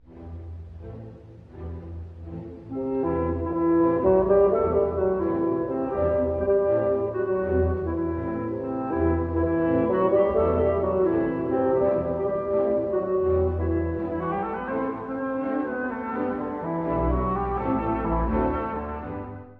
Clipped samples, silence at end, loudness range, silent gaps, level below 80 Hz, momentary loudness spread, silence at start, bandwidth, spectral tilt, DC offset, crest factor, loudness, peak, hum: under 0.1%; 0 s; 5 LU; none; -38 dBFS; 17 LU; 0.1 s; 3.8 kHz; -11.5 dB/octave; under 0.1%; 16 dB; -25 LUFS; -8 dBFS; none